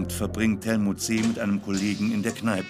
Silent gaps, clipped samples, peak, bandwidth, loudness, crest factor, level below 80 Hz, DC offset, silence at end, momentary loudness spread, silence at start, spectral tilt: none; under 0.1%; -10 dBFS; 16 kHz; -26 LUFS; 16 dB; -50 dBFS; under 0.1%; 0 s; 2 LU; 0 s; -5 dB/octave